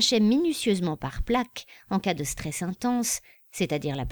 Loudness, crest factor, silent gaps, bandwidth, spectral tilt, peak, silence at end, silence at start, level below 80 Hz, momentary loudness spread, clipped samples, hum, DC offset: -27 LUFS; 18 dB; none; over 20 kHz; -4 dB/octave; -10 dBFS; 0 s; 0 s; -42 dBFS; 10 LU; under 0.1%; none; under 0.1%